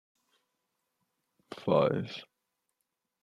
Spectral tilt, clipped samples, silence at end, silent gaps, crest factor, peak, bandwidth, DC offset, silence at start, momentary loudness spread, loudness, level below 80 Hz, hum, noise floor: -7.5 dB/octave; under 0.1%; 1 s; none; 24 dB; -12 dBFS; 10.5 kHz; under 0.1%; 1.5 s; 19 LU; -30 LUFS; -74 dBFS; none; -84 dBFS